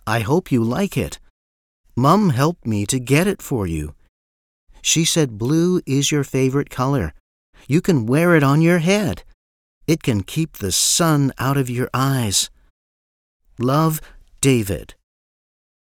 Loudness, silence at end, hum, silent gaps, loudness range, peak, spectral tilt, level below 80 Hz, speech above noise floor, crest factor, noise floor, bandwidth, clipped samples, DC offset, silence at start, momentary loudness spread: -18 LUFS; 0.9 s; none; 1.30-1.84 s, 4.09-4.67 s, 7.20-7.53 s, 9.34-9.81 s, 12.70-13.40 s; 3 LU; 0 dBFS; -4.5 dB/octave; -44 dBFS; over 72 dB; 18 dB; under -90 dBFS; 17.5 kHz; under 0.1%; under 0.1%; 0.05 s; 11 LU